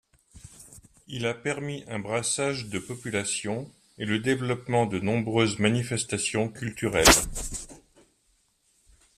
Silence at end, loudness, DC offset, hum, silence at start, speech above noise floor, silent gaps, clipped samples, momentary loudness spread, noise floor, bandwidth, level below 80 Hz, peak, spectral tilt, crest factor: 1.4 s; -26 LUFS; under 0.1%; none; 0.35 s; 42 dB; none; under 0.1%; 15 LU; -69 dBFS; 15 kHz; -44 dBFS; -2 dBFS; -3.5 dB/octave; 26 dB